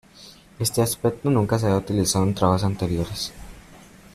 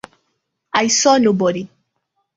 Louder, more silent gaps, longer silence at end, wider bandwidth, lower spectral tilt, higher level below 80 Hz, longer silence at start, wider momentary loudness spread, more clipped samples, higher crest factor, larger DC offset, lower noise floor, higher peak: second, -23 LUFS vs -15 LUFS; neither; second, 0.35 s vs 0.7 s; first, 15 kHz vs 8 kHz; first, -5.5 dB/octave vs -3 dB/octave; first, -46 dBFS vs -60 dBFS; second, 0.2 s vs 0.75 s; second, 7 LU vs 14 LU; neither; about the same, 18 dB vs 18 dB; neither; second, -48 dBFS vs -72 dBFS; about the same, -4 dBFS vs -2 dBFS